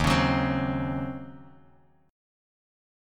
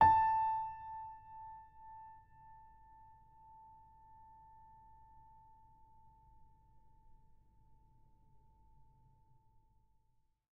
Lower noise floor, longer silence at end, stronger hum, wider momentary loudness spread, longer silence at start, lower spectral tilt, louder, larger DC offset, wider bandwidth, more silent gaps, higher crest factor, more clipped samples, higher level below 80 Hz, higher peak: second, -60 dBFS vs -76 dBFS; second, 0.95 s vs 8.4 s; neither; second, 17 LU vs 29 LU; about the same, 0 s vs 0 s; first, -6 dB/octave vs -4 dB/octave; first, -27 LUFS vs -35 LUFS; neither; first, 15.5 kHz vs 5.6 kHz; neither; second, 20 dB vs 26 dB; neither; first, -42 dBFS vs -66 dBFS; first, -10 dBFS vs -16 dBFS